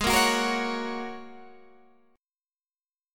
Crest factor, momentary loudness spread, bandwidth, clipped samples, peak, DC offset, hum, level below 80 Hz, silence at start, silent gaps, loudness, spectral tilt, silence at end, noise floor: 22 dB; 21 LU; 17.5 kHz; under 0.1%; -8 dBFS; under 0.1%; none; -50 dBFS; 0 s; 2.52-2.56 s; -26 LUFS; -2.5 dB/octave; 0 s; under -90 dBFS